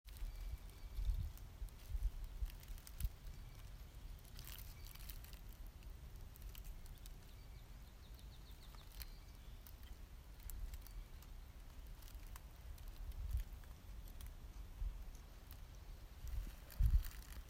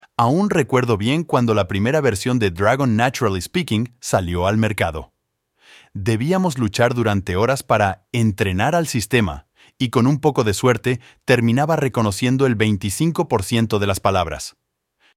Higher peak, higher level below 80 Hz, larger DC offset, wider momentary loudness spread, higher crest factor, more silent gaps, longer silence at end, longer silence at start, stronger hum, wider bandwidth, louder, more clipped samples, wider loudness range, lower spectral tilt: second, -24 dBFS vs -2 dBFS; about the same, -48 dBFS vs -44 dBFS; neither; first, 11 LU vs 6 LU; first, 24 dB vs 18 dB; neither; second, 0 s vs 0.65 s; second, 0.05 s vs 0.2 s; neither; about the same, 16 kHz vs 16 kHz; second, -52 LUFS vs -19 LUFS; neither; first, 8 LU vs 3 LU; about the same, -4.5 dB/octave vs -5.5 dB/octave